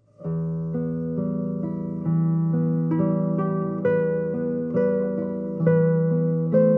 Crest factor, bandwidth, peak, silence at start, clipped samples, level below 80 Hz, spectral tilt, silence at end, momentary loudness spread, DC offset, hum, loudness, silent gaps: 16 dB; 2.6 kHz; -8 dBFS; 0.2 s; under 0.1%; -58 dBFS; -13 dB/octave; 0 s; 8 LU; under 0.1%; none; -24 LUFS; none